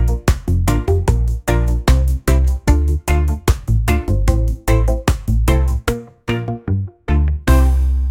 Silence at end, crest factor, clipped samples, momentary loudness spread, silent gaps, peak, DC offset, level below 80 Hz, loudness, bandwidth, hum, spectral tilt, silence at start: 0 s; 14 dB; under 0.1%; 6 LU; none; 0 dBFS; under 0.1%; -16 dBFS; -17 LUFS; 16.5 kHz; none; -6.5 dB/octave; 0 s